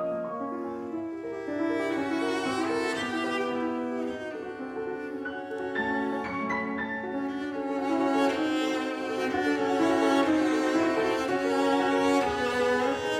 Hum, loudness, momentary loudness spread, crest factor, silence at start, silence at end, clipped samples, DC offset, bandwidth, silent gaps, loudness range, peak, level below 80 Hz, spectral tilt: none; -28 LUFS; 10 LU; 16 dB; 0 s; 0 s; under 0.1%; under 0.1%; 14.5 kHz; none; 7 LU; -12 dBFS; -64 dBFS; -4.5 dB/octave